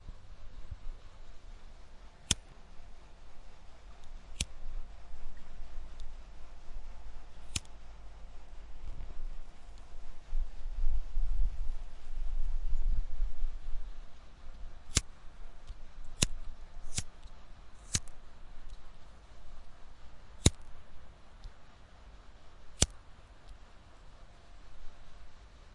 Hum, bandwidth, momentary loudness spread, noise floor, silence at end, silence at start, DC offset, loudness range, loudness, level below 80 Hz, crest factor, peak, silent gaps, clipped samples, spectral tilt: none; 11.5 kHz; 24 LU; -52 dBFS; 0.05 s; 0 s; under 0.1%; 9 LU; -38 LUFS; -38 dBFS; 28 dB; -4 dBFS; none; under 0.1%; -3 dB/octave